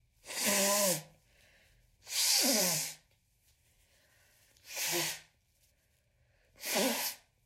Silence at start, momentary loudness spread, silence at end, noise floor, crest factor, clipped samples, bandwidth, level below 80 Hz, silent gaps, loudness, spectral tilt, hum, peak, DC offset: 0.25 s; 15 LU; 0.3 s; -73 dBFS; 20 dB; under 0.1%; 16 kHz; -74 dBFS; none; -30 LUFS; -1 dB/octave; none; -16 dBFS; under 0.1%